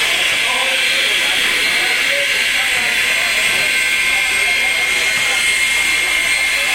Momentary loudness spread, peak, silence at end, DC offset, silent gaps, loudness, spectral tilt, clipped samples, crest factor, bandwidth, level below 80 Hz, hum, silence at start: 1 LU; -2 dBFS; 0 s; under 0.1%; none; -13 LUFS; 1 dB/octave; under 0.1%; 12 dB; 16 kHz; -46 dBFS; none; 0 s